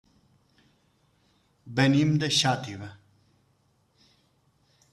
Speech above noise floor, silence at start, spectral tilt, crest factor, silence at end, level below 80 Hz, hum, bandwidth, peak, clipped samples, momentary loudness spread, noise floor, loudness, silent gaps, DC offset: 43 dB; 1.65 s; -4.5 dB/octave; 22 dB; 2 s; -66 dBFS; none; 13 kHz; -10 dBFS; under 0.1%; 19 LU; -68 dBFS; -24 LUFS; none; under 0.1%